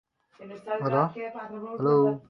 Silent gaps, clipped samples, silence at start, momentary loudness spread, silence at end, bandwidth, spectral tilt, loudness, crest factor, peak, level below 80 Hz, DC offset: none; under 0.1%; 0.4 s; 17 LU; 0.1 s; 5.8 kHz; -10 dB/octave; -27 LUFS; 20 dB; -8 dBFS; -74 dBFS; under 0.1%